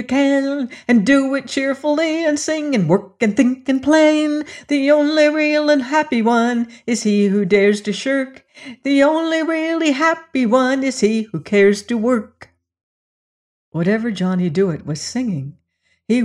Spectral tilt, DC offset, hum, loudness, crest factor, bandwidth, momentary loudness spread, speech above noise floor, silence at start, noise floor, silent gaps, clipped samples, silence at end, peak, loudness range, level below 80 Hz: -5.5 dB/octave; under 0.1%; none; -17 LUFS; 14 dB; 11 kHz; 8 LU; 49 dB; 0 s; -66 dBFS; 12.83-13.72 s; under 0.1%; 0 s; -4 dBFS; 6 LU; -60 dBFS